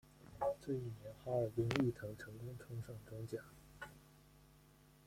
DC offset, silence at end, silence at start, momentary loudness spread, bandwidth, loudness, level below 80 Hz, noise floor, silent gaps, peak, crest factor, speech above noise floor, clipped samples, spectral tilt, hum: under 0.1%; 0.15 s; 0.05 s; 17 LU; 16.5 kHz; -43 LUFS; -66 dBFS; -66 dBFS; none; -16 dBFS; 28 dB; 24 dB; under 0.1%; -7 dB/octave; none